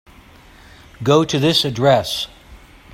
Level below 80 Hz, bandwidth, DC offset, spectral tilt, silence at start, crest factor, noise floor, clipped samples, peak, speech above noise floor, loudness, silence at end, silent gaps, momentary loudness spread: -48 dBFS; 16.5 kHz; under 0.1%; -5 dB/octave; 1 s; 18 dB; -45 dBFS; under 0.1%; -2 dBFS; 29 dB; -16 LUFS; 0.35 s; none; 10 LU